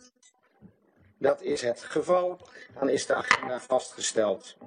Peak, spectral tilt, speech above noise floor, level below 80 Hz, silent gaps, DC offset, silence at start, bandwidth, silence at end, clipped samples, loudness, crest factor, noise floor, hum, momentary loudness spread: -2 dBFS; -3 dB/octave; 36 dB; -72 dBFS; none; under 0.1%; 0.65 s; 10 kHz; 0 s; under 0.1%; -28 LUFS; 26 dB; -64 dBFS; none; 7 LU